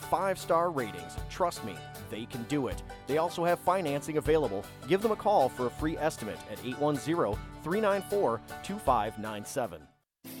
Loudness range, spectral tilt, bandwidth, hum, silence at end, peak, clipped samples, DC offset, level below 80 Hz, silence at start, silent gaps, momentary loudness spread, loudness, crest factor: 3 LU; -5.5 dB/octave; 18 kHz; none; 0 s; -14 dBFS; under 0.1%; under 0.1%; -50 dBFS; 0 s; none; 12 LU; -31 LUFS; 18 dB